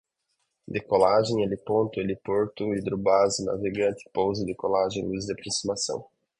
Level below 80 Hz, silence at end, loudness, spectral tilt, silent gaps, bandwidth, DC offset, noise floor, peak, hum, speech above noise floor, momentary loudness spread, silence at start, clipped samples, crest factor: -56 dBFS; 0.35 s; -26 LUFS; -4.5 dB/octave; none; 11 kHz; under 0.1%; -77 dBFS; -6 dBFS; none; 51 dB; 9 LU; 0.7 s; under 0.1%; 20 dB